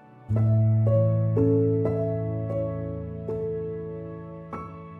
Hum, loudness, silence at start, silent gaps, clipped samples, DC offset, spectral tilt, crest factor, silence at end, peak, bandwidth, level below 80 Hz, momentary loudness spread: none; -25 LUFS; 0.15 s; none; under 0.1%; under 0.1%; -12.5 dB/octave; 14 dB; 0 s; -12 dBFS; 2.8 kHz; -48 dBFS; 16 LU